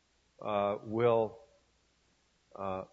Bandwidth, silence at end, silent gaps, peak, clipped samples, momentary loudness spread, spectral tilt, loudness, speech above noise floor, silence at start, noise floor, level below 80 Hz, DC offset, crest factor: 7.4 kHz; 0.1 s; none; -16 dBFS; under 0.1%; 12 LU; -8 dB/octave; -33 LUFS; 40 dB; 0.4 s; -72 dBFS; -72 dBFS; under 0.1%; 20 dB